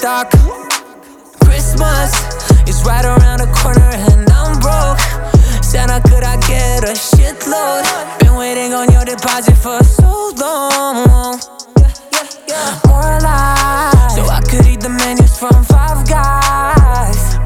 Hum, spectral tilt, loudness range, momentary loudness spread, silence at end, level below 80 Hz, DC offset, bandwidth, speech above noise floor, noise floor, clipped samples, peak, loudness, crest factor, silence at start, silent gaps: none; -5 dB/octave; 2 LU; 6 LU; 0 s; -12 dBFS; under 0.1%; 17 kHz; 27 dB; -37 dBFS; under 0.1%; 0 dBFS; -11 LUFS; 8 dB; 0 s; none